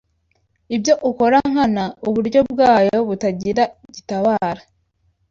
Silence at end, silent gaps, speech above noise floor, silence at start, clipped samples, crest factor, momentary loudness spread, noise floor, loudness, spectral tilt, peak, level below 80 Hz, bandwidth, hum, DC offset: 0.7 s; none; 48 dB; 0.7 s; under 0.1%; 16 dB; 11 LU; -65 dBFS; -17 LUFS; -5.5 dB/octave; -2 dBFS; -52 dBFS; 7.6 kHz; none; under 0.1%